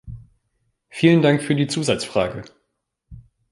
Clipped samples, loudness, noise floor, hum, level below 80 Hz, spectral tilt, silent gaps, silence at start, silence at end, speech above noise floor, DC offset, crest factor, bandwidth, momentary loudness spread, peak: under 0.1%; -19 LUFS; -75 dBFS; none; -50 dBFS; -6 dB/octave; none; 0.05 s; 0.3 s; 56 dB; under 0.1%; 20 dB; 11.5 kHz; 22 LU; -2 dBFS